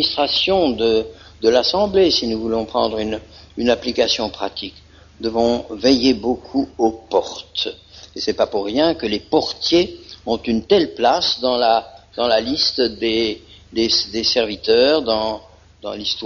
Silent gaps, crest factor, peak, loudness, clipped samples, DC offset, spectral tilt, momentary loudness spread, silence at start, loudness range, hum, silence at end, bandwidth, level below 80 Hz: none; 18 dB; -2 dBFS; -18 LUFS; under 0.1%; under 0.1%; -2 dB/octave; 11 LU; 0 s; 3 LU; none; 0 s; 7.2 kHz; -46 dBFS